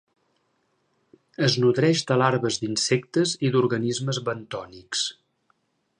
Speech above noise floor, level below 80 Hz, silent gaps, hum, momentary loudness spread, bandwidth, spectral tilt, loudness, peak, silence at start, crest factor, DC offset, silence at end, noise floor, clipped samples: 47 dB; -66 dBFS; none; none; 10 LU; 11 kHz; -4.5 dB/octave; -23 LUFS; -6 dBFS; 1.4 s; 20 dB; under 0.1%; 0.9 s; -70 dBFS; under 0.1%